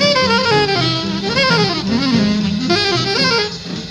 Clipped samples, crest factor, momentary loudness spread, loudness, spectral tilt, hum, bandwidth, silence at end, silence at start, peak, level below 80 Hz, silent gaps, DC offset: under 0.1%; 14 dB; 5 LU; -15 LUFS; -4.5 dB/octave; none; 11.5 kHz; 0 s; 0 s; 0 dBFS; -42 dBFS; none; under 0.1%